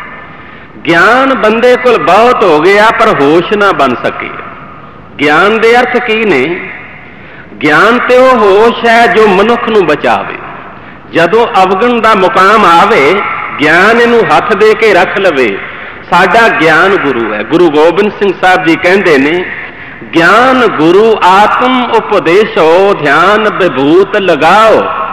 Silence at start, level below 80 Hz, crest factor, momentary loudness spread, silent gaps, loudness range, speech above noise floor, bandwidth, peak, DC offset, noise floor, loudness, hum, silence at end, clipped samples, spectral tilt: 0 s; -42 dBFS; 6 dB; 10 LU; none; 3 LU; 23 dB; 14 kHz; 0 dBFS; 1%; -29 dBFS; -6 LUFS; none; 0 s; 3%; -5 dB/octave